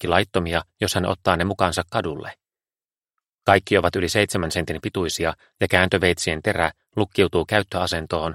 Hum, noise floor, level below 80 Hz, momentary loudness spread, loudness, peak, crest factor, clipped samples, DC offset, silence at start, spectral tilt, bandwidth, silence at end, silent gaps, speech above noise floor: none; under -90 dBFS; -44 dBFS; 8 LU; -22 LUFS; 0 dBFS; 22 dB; under 0.1%; under 0.1%; 0 s; -4.5 dB/octave; 16.5 kHz; 0 s; 2.98-3.02 s, 3.33-3.37 s; over 68 dB